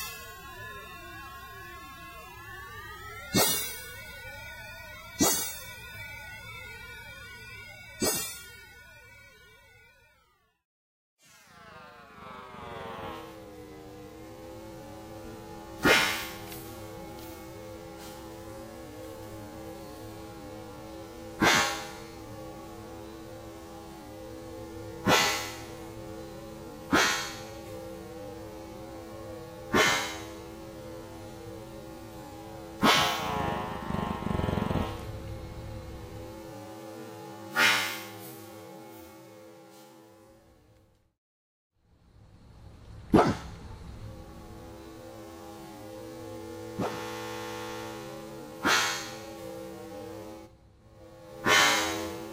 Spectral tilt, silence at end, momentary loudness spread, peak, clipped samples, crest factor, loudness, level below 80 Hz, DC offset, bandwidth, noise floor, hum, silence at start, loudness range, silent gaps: -3 dB/octave; 0 s; 22 LU; -8 dBFS; under 0.1%; 26 dB; -30 LUFS; -52 dBFS; under 0.1%; 16 kHz; -68 dBFS; none; 0 s; 14 LU; 10.65-11.17 s, 41.18-41.70 s